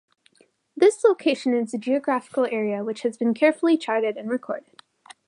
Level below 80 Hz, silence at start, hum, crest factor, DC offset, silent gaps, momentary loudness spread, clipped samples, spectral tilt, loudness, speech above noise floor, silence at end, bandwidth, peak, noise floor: -82 dBFS; 0.75 s; none; 18 dB; under 0.1%; none; 10 LU; under 0.1%; -5 dB/octave; -23 LUFS; 39 dB; 0.65 s; 11.5 kHz; -6 dBFS; -61 dBFS